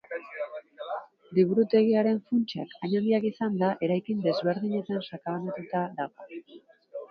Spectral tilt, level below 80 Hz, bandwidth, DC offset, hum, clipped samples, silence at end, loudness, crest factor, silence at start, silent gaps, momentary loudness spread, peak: -9 dB/octave; -76 dBFS; 6 kHz; under 0.1%; none; under 0.1%; 0.05 s; -28 LUFS; 18 dB; 0.1 s; none; 16 LU; -10 dBFS